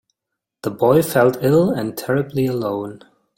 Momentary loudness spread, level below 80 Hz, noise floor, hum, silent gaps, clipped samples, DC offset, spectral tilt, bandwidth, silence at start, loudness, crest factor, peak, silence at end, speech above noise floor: 13 LU; -54 dBFS; -82 dBFS; none; none; under 0.1%; under 0.1%; -6.5 dB/octave; 17 kHz; 0.65 s; -18 LUFS; 18 dB; -2 dBFS; 0.4 s; 64 dB